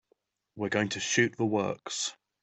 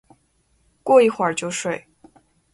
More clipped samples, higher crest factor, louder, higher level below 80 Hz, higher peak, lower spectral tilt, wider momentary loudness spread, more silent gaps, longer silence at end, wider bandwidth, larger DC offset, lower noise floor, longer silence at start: neither; about the same, 20 dB vs 20 dB; second, -30 LUFS vs -19 LUFS; second, -70 dBFS vs -64 dBFS; second, -12 dBFS vs -2 dBFS; about the same, -3.5 dB/octave vs -4 dB/octave; second, 8 LU vs 16 LU; neither; second, 0.3 s vs 0.75 s; second, 8.4 kHz vs 11.5 kHz; neither; first, -73 dBFS vs -64 dBFS; second, 0.55 s vs 0.85 s